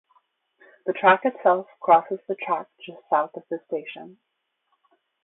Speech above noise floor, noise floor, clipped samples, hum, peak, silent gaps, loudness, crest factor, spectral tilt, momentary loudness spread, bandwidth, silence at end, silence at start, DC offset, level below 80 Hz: 50 dB; -73 dBFS; under 0.1%; none; -4 dBFS; none; -23 LUFS; 22 dB; -9 dB/octave; 18 LU; 4.1 kHz; 1.15 s; 0.85 s; under 0.1%; -78 dBFS